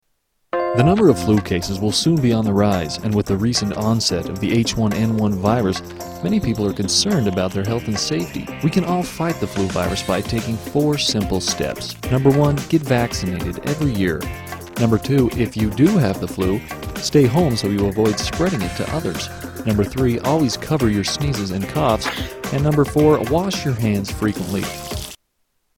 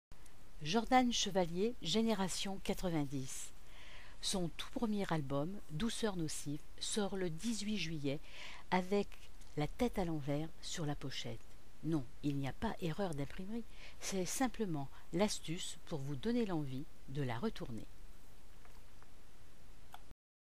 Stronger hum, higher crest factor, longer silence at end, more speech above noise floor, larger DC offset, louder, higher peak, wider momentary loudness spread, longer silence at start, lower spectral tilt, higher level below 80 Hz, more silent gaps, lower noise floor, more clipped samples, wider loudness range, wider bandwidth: neither; about the same, 18 dB vs 22 dB; first, 0.6 s vs 0.4 s; first, 50 dB vs 21 dB; second, under 0.1% vs 0.7%; first, -19 LUFS vs -40 LUFS; first, -2 dBFS vs -18 dBFS; second, 9 LU vs 13 LU; first, 0.55 s vs 0.1 s; about the same, -5.5 dB/octave vs -4.5 dB/octave; first, -38 dBFS vs -56 dBFS; neither; first, -68 dBFS vs -60 dBFS; neither; second, 2 LU vs 6 LU; first, 17.5 kHz vs 15.5 kHz